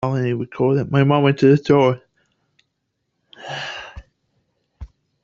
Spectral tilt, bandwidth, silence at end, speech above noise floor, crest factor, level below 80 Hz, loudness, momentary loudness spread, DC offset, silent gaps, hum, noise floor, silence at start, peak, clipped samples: -8 dB/octave; 7.2 kHz; 0.4 s; 58 dB; 18 dB; -50 dBFS; -18 LUFS; 18 LU; under 0.1%; none; none; -74 dBFS; 0 s; -2 dBFS; under 0.1%